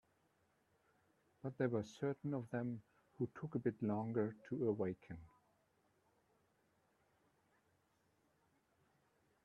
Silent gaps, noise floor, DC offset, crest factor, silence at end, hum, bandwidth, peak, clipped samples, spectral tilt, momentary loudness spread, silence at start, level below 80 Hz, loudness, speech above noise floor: none; -79 dBFS; under 0.1%; 22 dB; 4.15 s; none; 11.5 kHz; -24 dBFS; under 0.1%; -8.5 dB/octave; 11 LU; 1.45 s; -80 dBFS; -43 LUFS; 37 dB